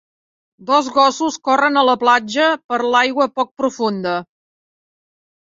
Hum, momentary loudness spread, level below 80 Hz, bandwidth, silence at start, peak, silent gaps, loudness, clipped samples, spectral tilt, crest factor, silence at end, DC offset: none; 8 LU; -66 dBFS; 7.8 kHz; 0.6 s; -2 dBFS; 2.64-2.69 s, 3.51-3.55 s; -16 LUFS; under 0.1%; -3.5 dB/octave; 16 dB; 1.35 s; under 0.1%